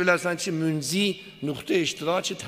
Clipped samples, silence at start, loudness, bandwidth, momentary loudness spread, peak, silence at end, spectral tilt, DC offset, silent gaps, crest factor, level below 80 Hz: under 0.1%; 0 s; -26 LUFS; 15.5 kHz; 8 LU; -6 dBFS; 0 s; -4 dB/octave; under 0.1%; none; 20 dB; -66 dBFS